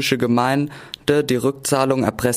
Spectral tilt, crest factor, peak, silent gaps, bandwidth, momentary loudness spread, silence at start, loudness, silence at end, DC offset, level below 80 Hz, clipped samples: -5 dB/octave; 16 dB; -4 dBFS; none; 15.5 kHz; 5 LU; 0 s; -19 LUFS; 0 s; under 0.1%; -50 dBFS; under 0.1%